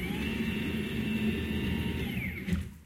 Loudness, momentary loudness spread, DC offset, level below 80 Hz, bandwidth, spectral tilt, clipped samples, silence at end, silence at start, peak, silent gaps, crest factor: -33 LUFS; 3 LU; under 0.1%; -46 dBFS; 16.5 kHz; -6 dB/octave; under 0.1%; 0 s; 0 s; -18 dBFS; none; 14 dB